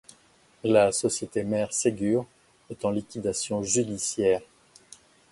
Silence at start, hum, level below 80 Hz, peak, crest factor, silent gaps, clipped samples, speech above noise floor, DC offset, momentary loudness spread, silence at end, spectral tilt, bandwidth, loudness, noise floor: 0.65 s; none; -60 dBFS; -6 dBFS; 20 dB; none; under 0.1%; 34 dB; under 0.1%; 9 LU; 0.85 s; -4 dB/octave; 11.5 kHz; -26 LUFS; -60 dBFS